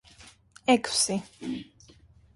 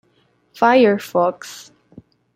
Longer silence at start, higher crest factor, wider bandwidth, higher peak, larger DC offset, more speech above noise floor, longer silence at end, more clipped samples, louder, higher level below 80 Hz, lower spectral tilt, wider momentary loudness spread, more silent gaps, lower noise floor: second, 0.25 s vs 0.6 s; about the same, 20 dB vs 18 dB; second, 11.5 kHz vs 16 kHz; second, -10 dBFS vs -2 dBFS; neither; second, 30 dB vs 44 dB; about the same, 0.7 s vs 0.75 s; neither; second, -27 LUFS vs -16 LUFS; about the same, -62 dBFS vs -66 dBFS; second, -2.5 dB/octave vs -5 dB/octave; second, 14 LU vs 22 LU; neither; second, -56 dBFS vs -61 dBFS